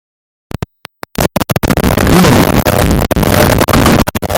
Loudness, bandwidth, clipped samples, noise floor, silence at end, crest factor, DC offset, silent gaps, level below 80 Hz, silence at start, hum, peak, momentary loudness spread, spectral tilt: -10 LUFS; over 20 kHz; 0.2%; -33 dBFS; 0 s; 10 dB; under 0.1%; none; -22 dBFS; 1.2 s; none; 0 dBFS; 17 LU; -5 dB/octave